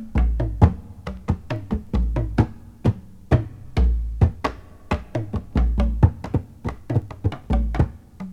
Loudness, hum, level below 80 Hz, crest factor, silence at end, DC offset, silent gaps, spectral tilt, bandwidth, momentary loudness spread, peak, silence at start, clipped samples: -24 LUFS; none; -26 dBFS; 20 dB; 0 s; under 0.1%; none; -9 dB/octave; 7.2 kHz; 10 LU; -2 dBFS; 0 s; under 0.1%